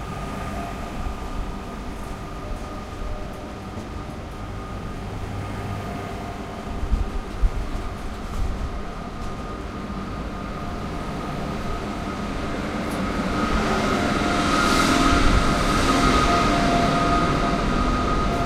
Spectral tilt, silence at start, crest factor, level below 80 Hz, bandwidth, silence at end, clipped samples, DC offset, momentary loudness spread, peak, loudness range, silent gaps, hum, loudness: -5 dB/octave; 0 s; 18 dB; -30 dBFS; 15.5 kHz; 0 s; under 0.1%; under 0.1%; 15 LU; -4 dBFS; 14 LU; none; none; -25 LUFS